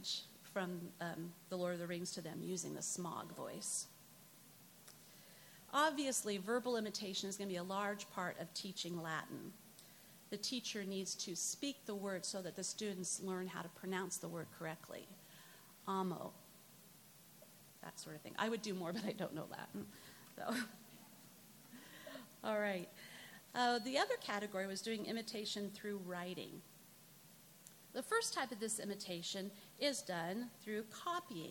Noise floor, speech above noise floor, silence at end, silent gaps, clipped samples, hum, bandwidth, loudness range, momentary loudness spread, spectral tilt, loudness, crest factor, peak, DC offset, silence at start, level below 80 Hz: -63 dBFS; 20 dB; 0 s; none; under 0.1%; none; 17.5 kHz; 6 LU; 20 LU; -3 dB/octave; -43 LUFS; 22 dB; -22 dBFS; under 0.1%; 0 s; -88 dBFS